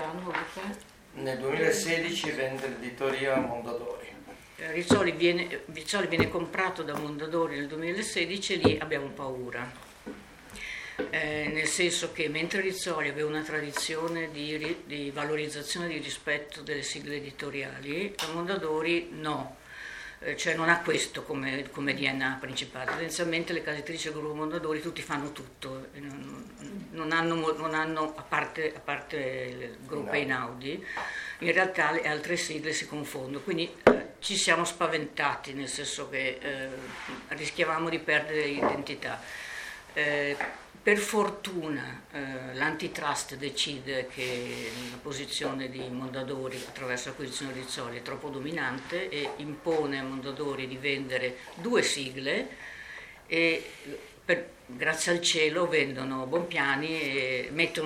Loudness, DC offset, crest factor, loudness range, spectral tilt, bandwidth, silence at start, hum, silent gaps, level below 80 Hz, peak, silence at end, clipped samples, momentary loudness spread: -30 LUFS; under 0.1%; 30 dB; 5 LU; -3.5 dB/octave; 16.5 kHz; 0 s; none; none; -62 dBFS; -2 dBFS; 0 s; under 0.1%; 12 LU